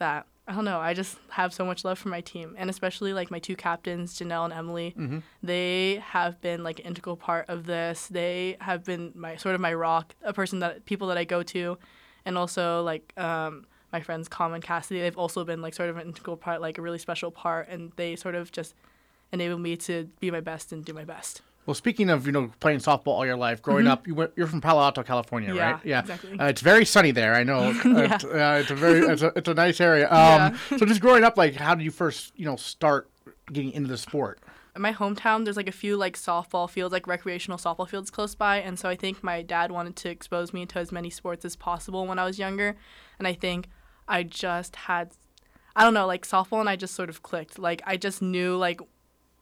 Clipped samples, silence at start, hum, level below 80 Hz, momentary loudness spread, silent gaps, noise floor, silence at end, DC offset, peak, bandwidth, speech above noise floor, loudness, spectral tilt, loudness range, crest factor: under 0.1%; 0 s; none; -60 dBFS; 15 LU; none; -59 dBFS; 0.55 s; under 0.1%; -8 dBFS; 17 kHz; 34 dB; -26 LUFS; -5 dB/octave; 12 LU; 18 dB